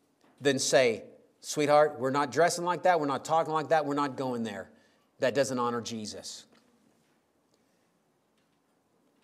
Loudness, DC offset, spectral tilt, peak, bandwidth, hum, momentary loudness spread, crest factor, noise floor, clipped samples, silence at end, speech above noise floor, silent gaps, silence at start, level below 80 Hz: -28 LUFS; under 0.1%; -4 dB/octave; -10 dBFS; 15.5 kHz; none; 15 LU; 20 dB; -72 dBFS; under 0.1%; 2.8 s; 44 dB; none; 0.4 s; -82 dBFS